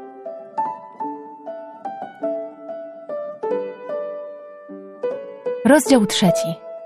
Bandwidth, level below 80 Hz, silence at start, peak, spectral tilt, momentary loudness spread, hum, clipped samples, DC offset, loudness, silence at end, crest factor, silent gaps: 14 kHz; -60 dBFS; 0 s; 0 dBFS; -4.5 dB/octave; 19 LU; none; under 0.1%; under 0.1%; -22 LUFS; 0 s; 22 dB; none